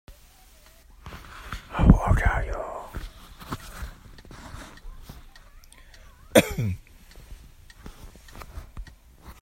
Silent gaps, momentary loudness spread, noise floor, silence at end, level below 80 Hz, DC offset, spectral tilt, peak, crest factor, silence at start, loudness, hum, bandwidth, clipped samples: none; 28 LU; -53 dBFS; 0.1 s; -32 dBFS; under 0.1%; -6 dB/octave; 0 dBFS; 28 dB; 0.1 s; -25 LUFS; none; 16 kHz; under 0.1%